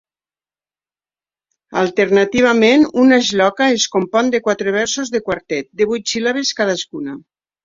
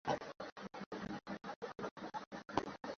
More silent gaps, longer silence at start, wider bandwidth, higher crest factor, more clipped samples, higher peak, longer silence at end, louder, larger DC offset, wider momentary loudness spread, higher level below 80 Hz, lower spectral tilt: second, none vs 0.52-0.56 s, 0.86-0.91 s, 1.56-1.62 s, 1.91-1.96 s, 2.27-2.31 s; first, 1.7 s vs 0.05 s; about the same, 7.8 kHz vs 7.4 kHz; second, 16 dB vs 28 dB; neither; first, -2 dBFS vs -18 dBFS; first, 0.45 s vs 0 s; first, -15 LUFS vs -46 LUFS; neither; first, 11 LU vs 7 LU; first, -56 dBFS vs -72 dBFS; about the same, -3.5 dB/octave vs -4 dB/octave